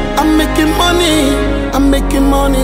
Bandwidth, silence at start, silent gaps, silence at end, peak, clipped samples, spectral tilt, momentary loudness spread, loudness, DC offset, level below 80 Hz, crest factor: 16.5 kHz; 0 s; none; 0 s; 0 dBFS; under 0.1%; -4.5 dB/octave; 3 LU; -12 LUFS; under 0.1%; -18 dBFS; 10 dB